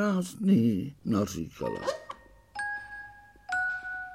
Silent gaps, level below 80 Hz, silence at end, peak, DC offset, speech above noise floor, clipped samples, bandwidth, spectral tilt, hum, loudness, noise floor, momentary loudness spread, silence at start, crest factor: none; -60 dBFS; 0 s; -14 dBFS; under 0.1%; 21 dB; under 0.1%; 15 kHz; -6 dB/octave; none; -30 LUFS; -49 dBFS; 20 LU; 0 s; 16 dB